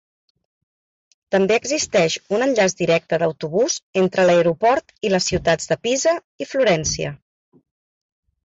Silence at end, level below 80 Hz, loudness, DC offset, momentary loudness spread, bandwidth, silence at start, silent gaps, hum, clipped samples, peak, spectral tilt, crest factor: 1.3 s; -48 dBFS; -19 LUFS; under 0.1%; 6 LU; 8.2 kHz; 1.3 s; 3.83-3.93 s, 6.24-6.39 s; none; under 0.1%; -6 dBFS; -4 dB/octave; 14 dB